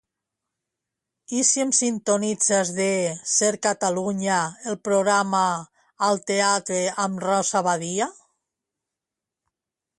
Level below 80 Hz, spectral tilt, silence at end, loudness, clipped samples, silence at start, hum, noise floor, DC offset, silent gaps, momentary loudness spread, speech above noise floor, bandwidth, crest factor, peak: -70 dBFS; -3 dB/octave; 1.85 s; -22 LUFS; under 0.1%; 1.3 s; none; -87 dBFS; under 0.1%; none; 6 LU; 65 dB; 11.5 kHz; 18 dB; -6 dBFS